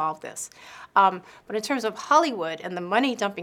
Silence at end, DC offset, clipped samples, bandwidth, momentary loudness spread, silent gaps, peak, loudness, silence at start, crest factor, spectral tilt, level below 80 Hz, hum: 0 s; under 0.1%; under 0.1%; 17 kHz; 15 LU; none; -4 dBFS; -24 LUFS; 0 s; 20 dB; -3.5 dB/octave; -72 dBFS; none